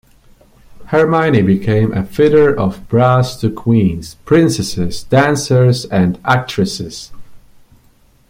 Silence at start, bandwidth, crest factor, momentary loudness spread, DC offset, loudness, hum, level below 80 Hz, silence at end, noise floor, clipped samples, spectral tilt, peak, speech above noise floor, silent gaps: 0.75 s; 16 kHz; 14 dB; 7 LU; under 0.1%; -14 LUFS; none; -40 dBFS; 0.9 s; -50 dBFS; under 0.1%; -6.5 dB/octave; 0 dBFS; 37 dB; none